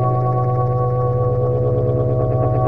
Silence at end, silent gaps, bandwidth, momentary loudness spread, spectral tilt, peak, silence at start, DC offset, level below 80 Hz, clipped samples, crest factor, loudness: 0 s; none; 2.6 kHz; 1 LU; -12.5 dB/octave; -6 dBFS; 0 s; 2%; -36 dBFS; under 0.1%; 10 dB; -18 LUFS